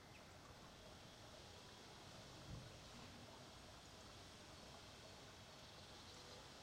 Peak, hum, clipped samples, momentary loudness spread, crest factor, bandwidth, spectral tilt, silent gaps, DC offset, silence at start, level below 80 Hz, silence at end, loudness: -44 dBFS; none; under 0.1%; 3 LU; 16 dB; 16 kHz; -3.5 dB/octave; none; under 0.1%; 0 s; -72 dBFS; 0 s; -59 LUFS